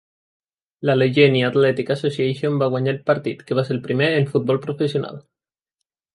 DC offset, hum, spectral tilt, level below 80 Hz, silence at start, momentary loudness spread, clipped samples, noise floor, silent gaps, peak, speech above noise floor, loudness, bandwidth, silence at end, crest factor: under 0.1%; none; -7.5 dB/octave; -64 dBFS; 0.8 s; 8 LU; under 0.1%; -82 dBFS; none; -2 dBFS; 62 dB; -20 LUFS; 11.5 kHz; 0.95 s; 18 dB